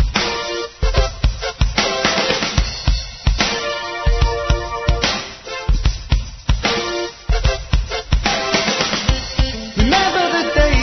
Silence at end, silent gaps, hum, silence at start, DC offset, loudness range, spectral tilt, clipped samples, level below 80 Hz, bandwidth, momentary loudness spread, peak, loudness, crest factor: 0 s; none; none; 0 s; under 0.1%; 3 LU; -4 dB/octave; under 0.1%; -20 dBFS; 6.4 kHz; 6 LU; 0 dBFS; -18 LUFS; 16 dB